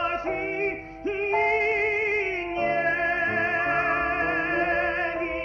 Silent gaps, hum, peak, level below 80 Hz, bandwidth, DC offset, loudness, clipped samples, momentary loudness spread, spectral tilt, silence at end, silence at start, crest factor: none; 50 Hz at -55 dBFS; -14 dBFS; -50 dBFS; 7.2 kHz; under 0.1%; -25 LUFS; under 0.1%; 6 LU; -6 dB/octave; 0 s; 0 s; 12 dB